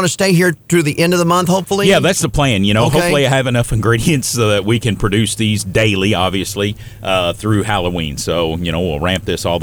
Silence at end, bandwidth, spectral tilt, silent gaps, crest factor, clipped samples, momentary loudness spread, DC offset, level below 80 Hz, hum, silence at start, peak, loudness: 0 s; over 20 kHz; -4.5 dB/octave; none; 12 dB; under 0.1%; 6 LU; under 0.1%; -34 dBFS; none; 0 s; -2 dBFS; -14 LUFS